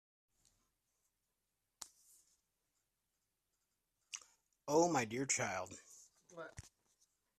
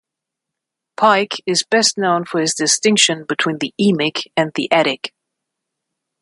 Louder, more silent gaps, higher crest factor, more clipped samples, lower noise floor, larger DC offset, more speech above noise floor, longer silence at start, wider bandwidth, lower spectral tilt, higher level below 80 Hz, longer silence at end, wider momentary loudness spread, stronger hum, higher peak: second, -37 LUFS vs -16 LUFS; neither; first, 24 dB vs 18 dB; neither; first, -88 dBFS vs -82 dBFS; neither; second, 50 dB vs 65 dB; first, 1.8 s vs 1 s; first, 14 kHz vs 11.5 kHz; about the same, -3.5 dB/octave vs -2.5 dB/octave; second, -80 dBFS vs -66 dBFS; second, 0.75 s vs 1.15 s; first, 25 LU vs 6 LU; neither; second, -20 dBFS vs 0 dBFS